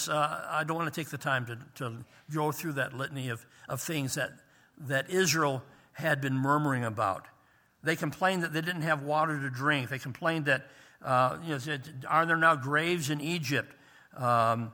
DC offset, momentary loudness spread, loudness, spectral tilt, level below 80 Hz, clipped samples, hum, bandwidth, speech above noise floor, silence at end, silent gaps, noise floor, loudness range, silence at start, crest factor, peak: under 0.1%; 12 LU; -30 LUFS; -4.5 dB/octave; -72 dBFS; under 0.1%; none; over 20 kHz; 35 dB; 0 s; none; -65 dBFS; 6 LU; 0 s; 22 dB; -10 dBFS